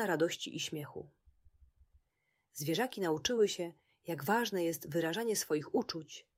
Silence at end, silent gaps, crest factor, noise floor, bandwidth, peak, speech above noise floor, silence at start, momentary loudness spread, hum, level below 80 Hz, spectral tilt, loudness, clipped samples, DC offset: 0.15 s; none; 18 dB; -82 dBFS; 16 kHz; -18 dBFS; 46 dB; 0 s; 12 LU; none; -72 dBFS; -4 dB/octave; -35 LUFS; under 0.1%; under 0.1%